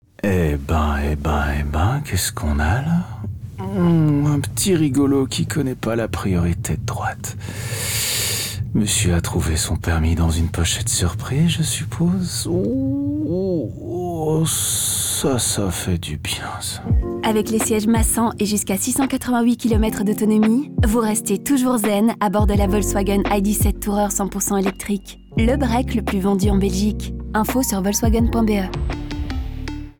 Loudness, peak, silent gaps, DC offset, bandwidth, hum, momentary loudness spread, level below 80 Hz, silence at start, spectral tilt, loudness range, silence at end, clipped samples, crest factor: -20 LUFS; -8 dBFS; none; under 0.1%; over 20 kHz; none; 8 LU; -30 dBFS; 0.25 s; -5 dB/octave; 3 LU; 0.1 s; under 0.1%; 10 dB